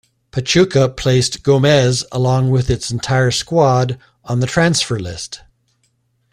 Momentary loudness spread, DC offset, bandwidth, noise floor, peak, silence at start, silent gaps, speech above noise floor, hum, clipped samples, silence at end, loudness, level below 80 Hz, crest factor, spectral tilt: 13 LU; under 0.1%; 11 kHz; -63 dBFS; 0 dBFS; 0.35 s; none; 48 dB; none; under 0.1%; 0.95 s; -15 LUFS; -40 dBFS; 16 dB; -5 dB/octave